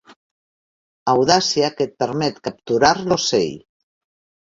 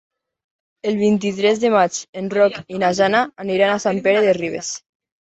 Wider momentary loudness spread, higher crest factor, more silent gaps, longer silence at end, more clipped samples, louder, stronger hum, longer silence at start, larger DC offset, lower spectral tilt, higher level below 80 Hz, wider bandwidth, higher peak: about the same, 9 LU vs 10 LU; about the same, 20 dB vs 16 dB; first, 0.16-1.06 s vs 2.09-2.13 s; first, 0.85 s vs 0.4 s; neither; about the same, -18 LUFS vs -18 LUFS; neither; second, 0.1 s vs 0.85 s; neither; about the same, -3.5 dB/octave vs -4.5 dB/octave; first, -54 dBFS vs -60 dBFS; about the same, 7.8 kHz vs 8.2 kHz; about the same, -2 dBFS vs -2 dBFS